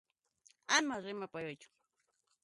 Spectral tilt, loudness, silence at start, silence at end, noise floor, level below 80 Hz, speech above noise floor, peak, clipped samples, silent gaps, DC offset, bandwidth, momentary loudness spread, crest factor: -1.5 dB/octave; -36 LUFS; 0.7 s; 0.8 s; -82 dBFS; -84 dBFS; 44 dB; -16 dBFS; under 0.1%; none; under 0.1%; 11.5 kHz; 21 LU; 24 dB